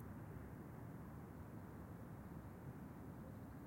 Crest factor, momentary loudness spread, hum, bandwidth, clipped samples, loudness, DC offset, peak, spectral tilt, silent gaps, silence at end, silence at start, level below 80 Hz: 14 dB; 1 LU; none; 16.5 kHz; under 0.1%; -55 LUFS; under 0.1%; -40 dBFS; -8 dB/octave; none; 0 s; 0 s; -66 dBFS